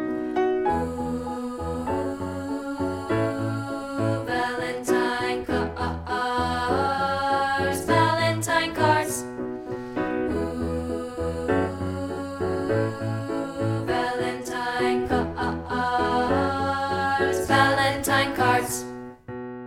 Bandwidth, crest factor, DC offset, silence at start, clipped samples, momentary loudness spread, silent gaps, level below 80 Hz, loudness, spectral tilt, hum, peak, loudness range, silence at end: 17 kHz; 20 dB; under 0.1%; 0 s; under 0.1%; 9 LU; none; -46 dBFS; -25 LUFS; -5 dB/octave; none; -6 dBFS; 5 LU; 0 s